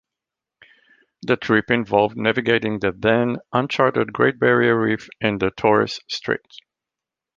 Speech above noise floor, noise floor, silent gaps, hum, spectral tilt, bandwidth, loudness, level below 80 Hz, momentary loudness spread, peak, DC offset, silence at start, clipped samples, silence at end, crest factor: 67 dB; -87 dBFS; none; none; -6.5 dB/octave; 7.4 kHz; -20 LUFS; -54 dBFS; 8 LU; -2 dBFS; under 0.1%; 1.25 s; under 0.1%; 1 s; 20 dB